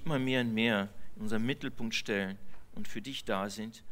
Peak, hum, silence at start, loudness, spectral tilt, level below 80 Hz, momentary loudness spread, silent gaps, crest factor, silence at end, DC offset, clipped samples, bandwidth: -14 dBFS; none; 0 s; -34 LUFS; -5 dB/octave; -58 dBFS; 14 LU; none; 20 dB; 0 s; under 0.1%; under 0.1%; 16 kHz